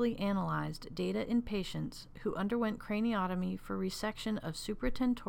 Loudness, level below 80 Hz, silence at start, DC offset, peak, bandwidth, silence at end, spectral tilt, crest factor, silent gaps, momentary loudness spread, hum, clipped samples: -36 LUFS; -50 dBFS; 0 s; under 0.1%; -20 dBFS; 17 kHz; 0 s; -6 dB/octave; 14 dB; none; 7 LU; none; under 0.1%